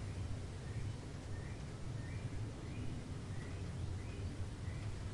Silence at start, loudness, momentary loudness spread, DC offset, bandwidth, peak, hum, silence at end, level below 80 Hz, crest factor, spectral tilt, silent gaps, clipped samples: 0 s; -46 LUFS; 2 LU; under 0.1%; 11.5 kHz; -30 dBFS; none; 0 s; -52 dBFS; 14 dB; -6.5 dB/octave; none; under 0.1%